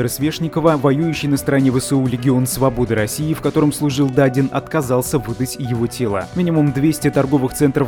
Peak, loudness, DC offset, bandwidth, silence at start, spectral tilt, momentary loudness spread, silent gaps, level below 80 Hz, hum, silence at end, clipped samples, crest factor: -2 dBFS; -17 LUFS; under 0.1%; 18.5 kHz; 0 s; -6 dB/octave; 5 LU; none; -40 dBFS; none; 0 s; under 0.1%; 16 dB